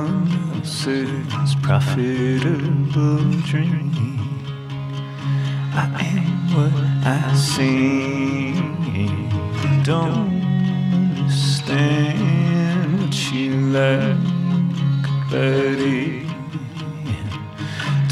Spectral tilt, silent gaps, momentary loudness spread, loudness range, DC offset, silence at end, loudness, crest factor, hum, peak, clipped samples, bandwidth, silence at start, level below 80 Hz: -6.5 dB/octave; none; 9 LU; 3 LU; under 0.1%; 0 s; -20 LUFS; 16 dB; none; -2 dBFS; under 0.1%; 12 kHz; 0 s; -52 dBFS